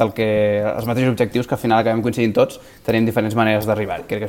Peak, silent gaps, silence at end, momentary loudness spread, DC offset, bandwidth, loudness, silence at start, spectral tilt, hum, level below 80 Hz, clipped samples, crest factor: -2 dBFS; none; 0 s; 4 LU; under 0.1%; 17.5 kHz; -19 LUFS; 0 s; -7 dB/octave; none; -48 dBFS; under 0.1%; 16 dB